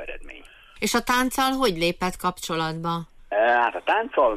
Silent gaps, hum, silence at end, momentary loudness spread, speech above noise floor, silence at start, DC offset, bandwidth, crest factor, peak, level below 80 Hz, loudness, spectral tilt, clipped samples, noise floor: none; none; 0 s; 10 LU; 22 dB; 0 s; under 0.1%; 15.5 kHz; 14 dB; -10 dBFS; -46 dBFS; -23 LUFS; -3.5 dB/octave; under 0.1%; -45 dBFS